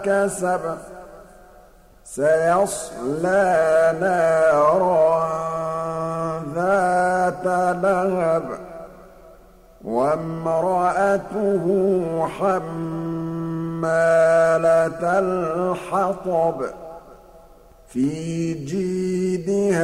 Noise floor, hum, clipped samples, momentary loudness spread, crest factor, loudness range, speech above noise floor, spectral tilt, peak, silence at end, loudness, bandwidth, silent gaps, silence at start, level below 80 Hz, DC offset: -49 dBFS; none; under 0.1%; 11 LU; 14 dB; 6 LU; 29 dB; -6.5 dB/octave; -6 dBFS; 0 s; -20 LUFS; 14.5 kHz; none; 0 s; -52 dBFS; under 0.1%